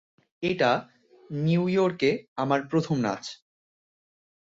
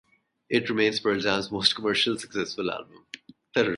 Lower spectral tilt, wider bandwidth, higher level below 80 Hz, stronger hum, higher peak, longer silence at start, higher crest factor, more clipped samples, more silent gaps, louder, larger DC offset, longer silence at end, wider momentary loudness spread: first, -6.5 dB/octave vs -3.5 dB/octave; second, 7.8 kHz vs 11.5 kHz; about the same, -66 dBFS vs -62 dBFS; neither; second, -10 dBFS vs -4 dBFS; about the same, 0.4 s vs 0.5 s; about the same, 18 dB vs 22 dB; neither; first, 2.28-2.36 s vs none; about the same, -26 LUFS vs -25 LUFS; neither; first, 1.25 s vs 0 s; second, 9 LU vs 20 LU